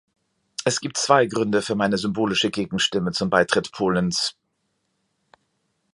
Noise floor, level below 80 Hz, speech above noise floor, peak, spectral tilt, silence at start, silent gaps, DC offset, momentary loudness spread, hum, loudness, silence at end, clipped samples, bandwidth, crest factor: -73 dBFS; -56 dBFS; 52 dB; -2 dBFS; -4 dB/octave; 0.6 s; none; under 0.1%; 6 LU; none; -22 LUFS; 1.65 s; under 0.1%; 11.5 kHz; 22 dB